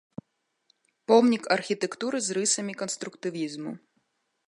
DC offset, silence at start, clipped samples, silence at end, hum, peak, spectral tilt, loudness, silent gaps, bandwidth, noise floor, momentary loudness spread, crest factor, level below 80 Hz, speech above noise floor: under 0.1%; 1.1 s; under 0.1%; 0.7 s; none; -6 dBFS; -3 dB/octave; -26 LUFS; none; 11.5 kHz; -78 dBFS; 20 LU; 22 dB; -80 dBFS; 51 dB